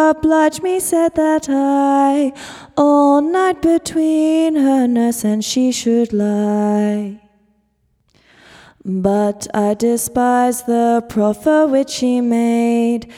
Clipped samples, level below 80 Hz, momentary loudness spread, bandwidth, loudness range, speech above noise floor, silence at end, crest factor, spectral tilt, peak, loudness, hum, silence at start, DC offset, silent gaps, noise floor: under 0.1%; -50 dBFS; 5 LU; 16 kHz; 6 LU; 48 dB; 0 s; 14 dB; -5 dB/octave; 0 dBFS; -15 LUFS; none; 0 s; under 0.1%; none; -62 dBFS